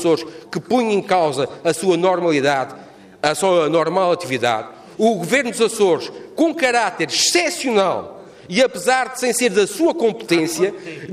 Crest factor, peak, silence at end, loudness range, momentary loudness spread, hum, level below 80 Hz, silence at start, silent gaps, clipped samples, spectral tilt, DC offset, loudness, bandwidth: 14 dB; -4 dBFS; 0 s; 1 LU; 6 LU; none; -62 dBFS; 0 s; none; under 0.1%; -3.5 dB/octave; under 0.1%; -18 LUFS; 15.5 kHz